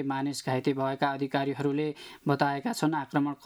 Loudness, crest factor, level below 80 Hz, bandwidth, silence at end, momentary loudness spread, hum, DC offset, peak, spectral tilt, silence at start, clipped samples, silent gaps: -30 LUFS; 18 dB; -74 dBFS; 14 kHz; 0 s; 4 LU; none; under 0.1%; -10 dBFS; -6 dB/octave; 0 s; under 0.1%; none